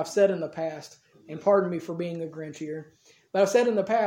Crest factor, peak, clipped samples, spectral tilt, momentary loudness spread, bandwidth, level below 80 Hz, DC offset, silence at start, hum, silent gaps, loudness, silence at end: 18 dB; -10 dBFS; under 0.1%; -5.5 dB/octave; 14 LU; 16 kHz; -78 dBFS; under 0.1%; 0 s; none; none; -27 LUFS; 0 s